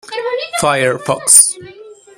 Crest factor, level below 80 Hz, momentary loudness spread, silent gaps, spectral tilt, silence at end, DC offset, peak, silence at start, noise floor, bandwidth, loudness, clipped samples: 14 dB; -54 dBFS; 14 LU; none; -1.5 dB/octave; 0.25 s; under 0.1%; 0 dBFS; 0.05 s; -37 dBFS; over 20 kHz; -11 LUFS; 0.5%